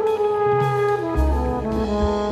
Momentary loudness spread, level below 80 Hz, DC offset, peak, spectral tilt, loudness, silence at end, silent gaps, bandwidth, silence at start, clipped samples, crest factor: 4 LU; -28 dBFS; under 0.1%; -8 dBFS; -7.5 dB/octave; -21 LUFS; 0 s; none; 14 kHz; 0 s; under 0.1%; 12 dB